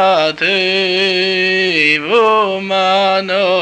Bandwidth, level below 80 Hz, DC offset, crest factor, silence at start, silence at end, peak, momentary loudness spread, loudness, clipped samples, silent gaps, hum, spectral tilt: 9.6 kHz; -58 dBFS; under 0.1%; 12 dB; 0 s; 0 s; -2 dBFS; 3 LU; -12 LUFS; under 0.1%; none; none; -4 dB/octave